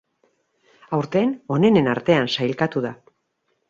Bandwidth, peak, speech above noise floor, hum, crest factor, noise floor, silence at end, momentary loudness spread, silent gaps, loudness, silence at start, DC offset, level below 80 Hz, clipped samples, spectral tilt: 7.6 kHz; -4 dBFS; 52 dB; none; 18 dB; -71 dBFS; 0.75 s; 10 LU; none; -21 LUFS; 0.9 s; under 0.1%; -60 dBFS; under 0.1%; -7 dB/octave